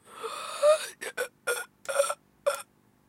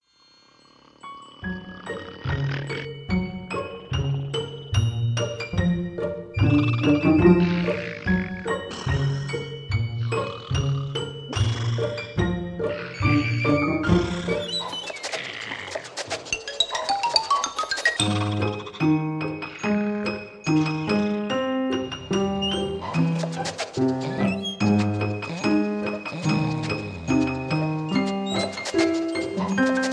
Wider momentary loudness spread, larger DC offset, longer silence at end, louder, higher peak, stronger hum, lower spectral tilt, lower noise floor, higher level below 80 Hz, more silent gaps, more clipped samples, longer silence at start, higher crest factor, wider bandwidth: first, 13 LU vs 9 LU; neither; first, 0.45 s vs 0 s; second, -30 LUFS vs -25 LUFS; second, -12 dBFS vs -4 dBFS; first, 50 Hz at -70 dBFS vs none; second, 0.5 dB/octave vs -5.5 dB/octave; second, -50 dBFS vs -57 dBFS; second, -80 dBFS vs -44 dBFS; neither; neither; second, 0.1 s vs 1.05 s; about the same, 20 dB vs 20 dB; first, 16 kHz vs 11 kHz